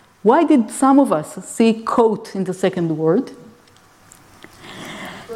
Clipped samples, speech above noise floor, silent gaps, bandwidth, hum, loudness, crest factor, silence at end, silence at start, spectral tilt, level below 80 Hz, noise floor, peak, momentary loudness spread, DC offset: under 0.1%; 34 dB; none; 14.5 kHz; none; -17 LUFS; 16 dB; 0 s; 0.25 s; -6 dB/octave; -60 dBFS; -50 dBFS; -2 dBFS; 19 LU; under 0.1%